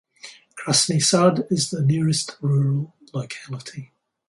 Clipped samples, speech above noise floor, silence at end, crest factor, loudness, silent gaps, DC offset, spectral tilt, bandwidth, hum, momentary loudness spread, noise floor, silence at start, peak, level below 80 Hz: under 0.1%; 25 dB; 0.45 s; 18 dB; -20 LUFS; none; under 0.1%; -4.5 dB/octave; 11.5 kHz; none; 21 LU; -46 dBFS; 0.25 s; -4 dBFS; -64 dBFS